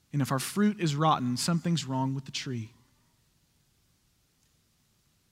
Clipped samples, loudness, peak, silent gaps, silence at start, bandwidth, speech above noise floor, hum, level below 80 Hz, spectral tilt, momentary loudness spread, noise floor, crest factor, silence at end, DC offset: under 0.1%; -29 LUFS; -12 dBFS; none; 0.15 s; 16 kHz; 41 dB; none; -70 dBFS; -5 dB/octave; 10 LU; -70 dBFS; 20 dB; 2.65 s; under 0.1%